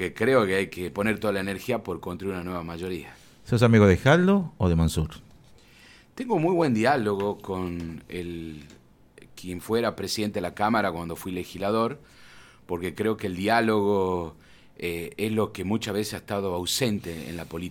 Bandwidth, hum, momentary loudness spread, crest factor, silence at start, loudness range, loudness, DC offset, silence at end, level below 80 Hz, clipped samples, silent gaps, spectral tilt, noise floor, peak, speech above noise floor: 17.5 kHz; none; 15 LU; 22 dB; 0 s; 6 LU; -26 LUFS; under 0.1%; 0 s; -48 dBFS; under 0.1%; none; -6 dB/octave; -53 dBFS; -4 dBFS; 28 dB